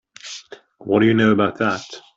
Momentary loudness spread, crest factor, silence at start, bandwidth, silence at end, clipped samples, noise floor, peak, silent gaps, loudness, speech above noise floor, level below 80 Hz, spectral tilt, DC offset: 20 LU; 16 dB; 0.25 s; 7.8 kHz; 0.15 s; under 0.1%; -40 dBFS; -4 dBFS; none; -18 LUFS; 23 dB; -58 dBFS; -6 dB/octave; under 0.1%